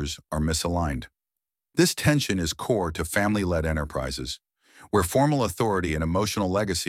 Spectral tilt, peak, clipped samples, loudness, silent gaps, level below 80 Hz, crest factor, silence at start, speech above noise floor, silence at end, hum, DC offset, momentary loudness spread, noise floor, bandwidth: -5 dB/octave; -8 dBFS; under 0.1%; -25 LUFS; none; -40 dBFS; 18 dB; 0 s; 64 dB; 0 s; none; under 0.1%; 9 LU; -88 dBFS; 16.5 kHz